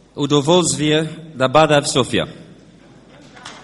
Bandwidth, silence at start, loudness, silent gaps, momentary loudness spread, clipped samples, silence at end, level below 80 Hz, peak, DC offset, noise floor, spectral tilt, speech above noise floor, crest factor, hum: 11.5 kHz; 0.15 s; -16 LUFS; none; 15 LU; under 0.1%; 0.05 s; -50 dBFS; 0 dBFS; under 0.1%; -45 dBFS; -4 dB/octave; 29 dB; 18 dB; none